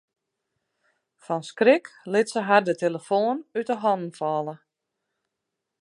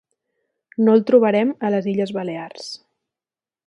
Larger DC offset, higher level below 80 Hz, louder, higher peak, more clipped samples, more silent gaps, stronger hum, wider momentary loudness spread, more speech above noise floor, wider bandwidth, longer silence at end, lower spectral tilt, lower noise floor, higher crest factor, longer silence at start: neither; second, -82 dBFS vs -70 dBFS; second, -24 LUFS vs -18 LUFS; about the same, -4 dBFS vs -2 dBFS; neither; neither; neither; second, 11 LU vs 19 LU; second, 60 dB vs over 72 dB; about the same, 11.5 kHz vs 10.5 kHz; first, 1.25 s vs 0.9 s; second, -5.5 dB/octave vs -7 dB/octave; second, -83 dBFS vs under -90 dBFS; about the same, 22 dB vs 18 dB; first, 1.3 s vs 0.8 s